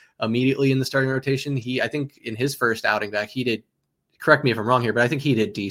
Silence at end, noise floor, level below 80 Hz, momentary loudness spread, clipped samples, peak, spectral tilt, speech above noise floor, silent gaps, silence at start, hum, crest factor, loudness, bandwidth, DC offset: 0 s; -57 dBFS; -62 dBFS; 8 LU; under 0.1%; -2 dBFS; -6 dB/octave; 35 dB; none; 0.2 s; none; 20 dB; -22 LUFS; 16.5 kHz; under 0.1%